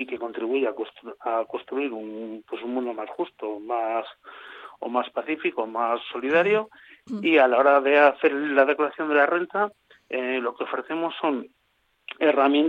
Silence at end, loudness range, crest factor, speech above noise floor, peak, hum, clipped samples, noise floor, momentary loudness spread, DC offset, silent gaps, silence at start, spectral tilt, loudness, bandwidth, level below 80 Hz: 0 s; 10 LU; 20 dB; 45 dB; -6 dBFS; none; under 0.1%; -69 dBFS; 17 LU; under 0.1%; none; 0 s; -6.5 dB/octave; -24 LUFS; 6.4 kHz; -76 dBFS